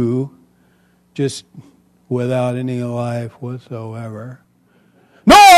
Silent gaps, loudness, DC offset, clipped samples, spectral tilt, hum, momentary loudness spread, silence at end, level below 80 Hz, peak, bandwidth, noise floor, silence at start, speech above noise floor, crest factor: none; -18 LUFS; under 0.1%; under 0.1%; -4 dB/octave; 60 Hz at -40 dBFS; 15 LU; 0 s; -44 dBFS; 0 dBFS; 13.5 kHz; -55 dBFS; 0 s; 34 dB; 16 dB